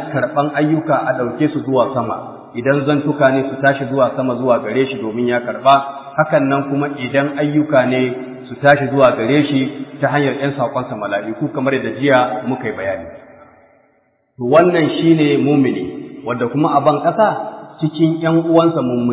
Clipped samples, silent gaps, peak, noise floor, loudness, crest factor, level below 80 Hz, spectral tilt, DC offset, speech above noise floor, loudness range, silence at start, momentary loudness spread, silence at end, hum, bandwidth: under 0.1%; none; 0 dBFS; -59 dBFS; -16 LUFS; 16 dB; -56 dBFS; -11 dB/octave; under 0.1%; 44 dB; 3 LU; 0 s; 10 LU; 0 s; none; 4 kHz